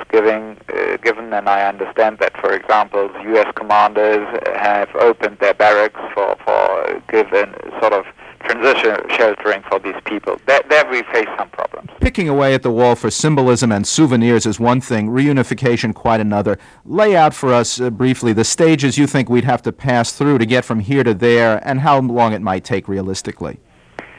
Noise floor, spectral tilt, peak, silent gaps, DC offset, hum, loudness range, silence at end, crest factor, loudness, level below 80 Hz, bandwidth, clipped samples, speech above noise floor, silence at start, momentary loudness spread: -36 dBFS; -5 dB/octave; -2 dBFS; none; under 0.1%; none; 2 LU; 0.15 s; 14 dB; -15 LUFS; -40 dBFS; 10.5 kHz; under 0.1%; 22 dB; 0 s; 9 LU